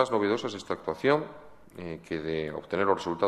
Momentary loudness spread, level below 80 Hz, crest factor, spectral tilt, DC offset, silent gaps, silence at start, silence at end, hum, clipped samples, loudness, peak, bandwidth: 15 LU; -60 dBFS; 20 dB; -5.5 dB/octave; under 0.1%; none; 0 s; 0 s; none; under 0.1%; -29 LUFS; -8 dBFS; 12 kHz